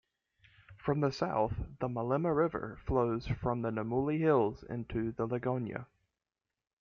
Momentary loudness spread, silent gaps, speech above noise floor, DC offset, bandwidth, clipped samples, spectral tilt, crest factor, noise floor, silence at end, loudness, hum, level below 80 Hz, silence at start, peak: 9 LU; none; over 57 dB; under 0.1%; 7.2 kHz; under 0.1%; -8.5 dB/octave; 18 dB; under -90 dBFS; 0.95 s; -34 LUFS; none; -52 dBFS; 0.7 s; -16 dBFS